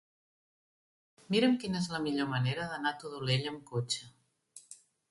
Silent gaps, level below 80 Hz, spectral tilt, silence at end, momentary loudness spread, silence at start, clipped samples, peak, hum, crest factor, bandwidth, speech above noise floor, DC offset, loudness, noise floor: none; -70 dBFS; -5 dB/octave; 0.35 s; 18 LU; 1.3 s; under 0.1%; -16 dBFS; none; 18 dB; 11.5 kHz; 26 dB; under 0.1%; -33 LUFS; -59 dBFS